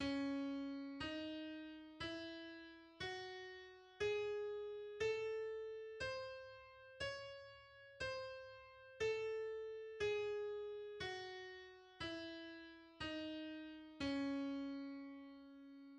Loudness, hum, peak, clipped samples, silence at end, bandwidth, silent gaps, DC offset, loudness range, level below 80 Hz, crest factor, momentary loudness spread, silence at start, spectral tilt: -47 LUFS; none; -32 dBFS; under 0.1%; 0 s; 9.8 kHz; none; under 0.1%; 4 LU; -72 dBFS; 16 dB; 16 LU; 0 s; -4.5 dB/octave